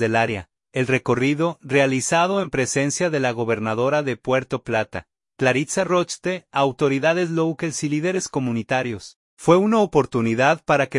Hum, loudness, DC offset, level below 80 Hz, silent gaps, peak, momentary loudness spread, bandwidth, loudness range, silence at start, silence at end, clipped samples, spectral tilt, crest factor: none; -21 LUFS; under 0.1%; -56 dBFS; 9.16-9.37 s; -2 dBFS; 7 LU; 11.5 kHz; 2 LU; 0 s; 0 s; under 0.1%; -5 dB/octave; 18 dB